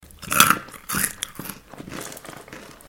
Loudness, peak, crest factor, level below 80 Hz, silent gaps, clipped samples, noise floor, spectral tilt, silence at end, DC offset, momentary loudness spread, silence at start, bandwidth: -20 LUFS; 0 dBFS; 26 dB; -52 dBFS; none; under 0.1%; -42 dBFS; -1.5 dB/octave; 0.15 s; under 0.1%; 23 LU; 0.2 s; 17 kHz